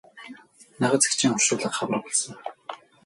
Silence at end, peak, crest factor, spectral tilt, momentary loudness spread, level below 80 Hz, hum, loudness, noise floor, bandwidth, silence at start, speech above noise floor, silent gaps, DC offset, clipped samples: 0.3 s; -4 dBFS; 24 dB; -2.5 dB/octave; 22 LU; -70 dBFS; none; -23 LUFS; -48 dBFS; 12 kHz; 0.15 s; 24 dB; none; under 0.1%; under 0.1%